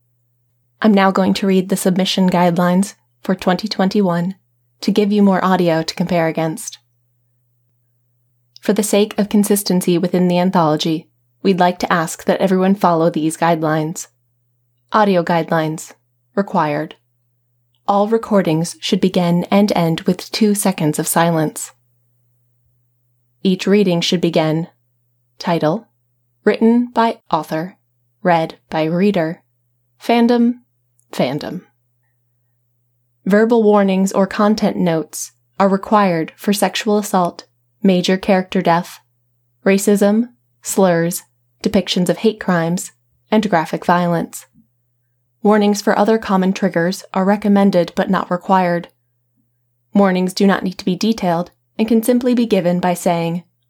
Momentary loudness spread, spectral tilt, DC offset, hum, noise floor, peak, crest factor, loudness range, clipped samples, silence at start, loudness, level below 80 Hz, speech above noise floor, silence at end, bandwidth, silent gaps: 10 LU; -5.5 dB/octave; under 0.1%; none; -65 dBFS; -2 dBFS; 16 dB; 4 LU; under 0.1%; 0.8 s; -16 LUFS; -56 dBFS; 50 dB; 0.3 s; 17 kHz; none